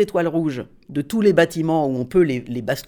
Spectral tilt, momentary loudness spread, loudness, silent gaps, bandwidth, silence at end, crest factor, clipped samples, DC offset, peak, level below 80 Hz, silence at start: -6.5 dB/octave; 11 LU; -20 LUFS; none; over 20 kHz; 0.05 s; 16 dB; under 0.1%; under 0.1%; -4 dBFS; -50 dBFS; 0 s